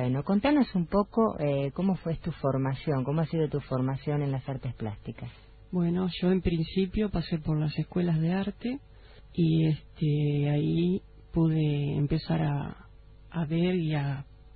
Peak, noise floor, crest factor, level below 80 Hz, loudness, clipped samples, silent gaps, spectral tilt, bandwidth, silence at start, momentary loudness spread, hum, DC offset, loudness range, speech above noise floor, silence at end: -10 dBFS; -51 dBFS; 18 dB; -48 dBFS; -29 LUFS; under 0.1%; none; -12 dB/octave; 4.7 kHz; 0 s; 10 LU; none; under 0.1%; 3 LU; 24 dB; 0 s